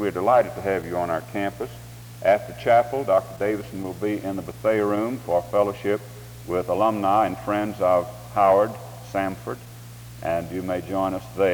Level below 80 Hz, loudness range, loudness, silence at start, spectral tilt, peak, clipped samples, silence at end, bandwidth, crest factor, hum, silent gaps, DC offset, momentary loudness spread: -52 dBFS; 3 LU; -24 LUFS; 0 s; -6.5 dB/octave; -6 dBFS; under 0.1%; 0 s; over 20 kHz; 16 dB; none; none; under 0.1%; 15 LU